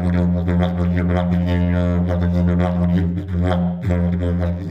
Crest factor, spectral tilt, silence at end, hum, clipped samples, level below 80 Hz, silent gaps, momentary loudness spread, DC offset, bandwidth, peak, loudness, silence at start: 12 dB; -9.5 dB/octave; 0 s; none; under 0.1%; -32 dBFS; none; 3 LU; under 0.1%; 5.4 kHz; -4 dBFS; -19 LUFS; 0 s